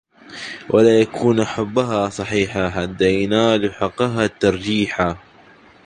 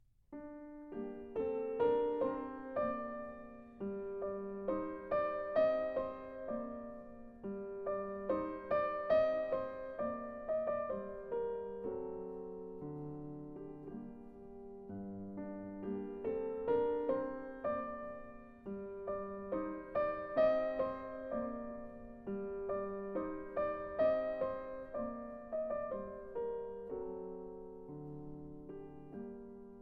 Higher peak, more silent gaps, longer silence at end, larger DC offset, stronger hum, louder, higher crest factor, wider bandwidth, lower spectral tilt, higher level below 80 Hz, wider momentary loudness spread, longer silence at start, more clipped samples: first, -2 dBFS vs -22 dBFS; neither; first, 0.7 s vs 0 s; neither; neither; first, -18 LUFS vs -40 LUFS; about the same, 18 dB vs 18 dB; first, 10 kHz vs 5.2 kHz; second, -5.5 dB/octave vs -9 dB/octave; first, -46 dBFS vs -64 dBFS; second, 8 LU vs 17 LU; about the same, 0.3 s vs 0.3 s; neither